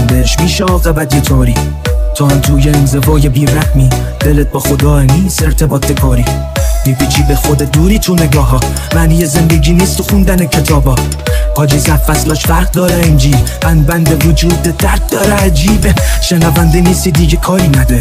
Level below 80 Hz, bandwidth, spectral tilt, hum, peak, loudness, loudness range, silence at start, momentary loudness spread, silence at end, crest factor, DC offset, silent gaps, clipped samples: -14 dBFS; 16.5 kHz; -5.5 dB/octave; none; 0 dBFS; -10 LUFS; 1 LU; 0 s; 4 LU; 0 s; 8 dB; under 0.1%; none; 0.3%